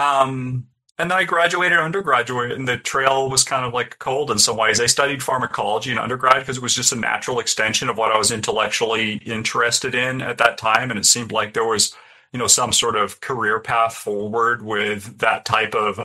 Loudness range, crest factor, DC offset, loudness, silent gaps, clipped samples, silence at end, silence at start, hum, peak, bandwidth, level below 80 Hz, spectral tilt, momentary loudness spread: 2 LU; 20 dB; under 0.1%; -18 LUFS; none; under 0.1%; 0 s; 0 s; none; 0 dBFS; 16 kHz; -56 dBFS; -2 dB/octave; 8 LU